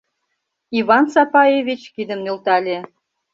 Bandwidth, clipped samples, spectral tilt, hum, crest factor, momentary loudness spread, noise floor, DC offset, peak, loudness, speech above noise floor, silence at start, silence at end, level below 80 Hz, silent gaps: 7.8 kHz; under 0.1%; -5.5 dB/octave; none; 16 dB; 13 LU; -74 dBFS; under 0.1%; -2 dBFS; -17 LUFS; 58 dB; 0.7 s; 0.5 s; -66 dBFS; none